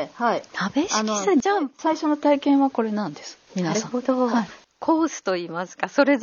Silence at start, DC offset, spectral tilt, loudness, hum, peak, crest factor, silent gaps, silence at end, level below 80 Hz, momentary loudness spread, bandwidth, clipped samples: 0 s; under 0.1%; -4 dB/octave; -23 LUFS; none; -4 dBFS; 18 dB; none; 0 s; -68 dBFS; 9 LU; 7.2 kHz; under 0.1%